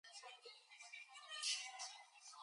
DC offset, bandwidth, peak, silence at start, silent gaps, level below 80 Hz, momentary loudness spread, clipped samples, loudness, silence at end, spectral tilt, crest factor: under 0.1%; 11 kHz; -30 dBFS; 0.05 s; none; under -90 dBFS; 17 LU; under 0.1%; -48 LUFS; 0 s; 7 dB/octave; 24 dB